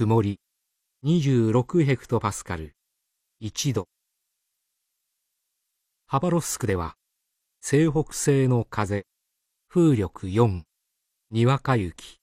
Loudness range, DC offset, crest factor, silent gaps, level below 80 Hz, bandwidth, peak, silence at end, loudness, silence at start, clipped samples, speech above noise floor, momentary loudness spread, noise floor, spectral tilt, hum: 9 LU; under 0.1%; 18 dB; none; -52 dBFS; 14.5 kHz; -8 dBFS; 0.1 s; -24 LUFS; 0 s; under 0.1%; 56 dB; 14 LU; -79 dBFS; -6.5 dB/octave; none